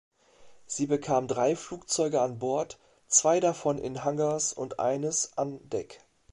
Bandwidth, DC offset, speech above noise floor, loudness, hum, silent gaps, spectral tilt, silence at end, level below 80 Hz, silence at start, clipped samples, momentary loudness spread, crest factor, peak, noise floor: 11.5 kHz; under 0.1%; 27 dB; -28 LUFS; none; none; -4 dB/octave; 0.35 s; -66 dBFS; 0.4 s; under 0.1%; 12 LU; 22 dB; -6 dBFS; -55 dBFS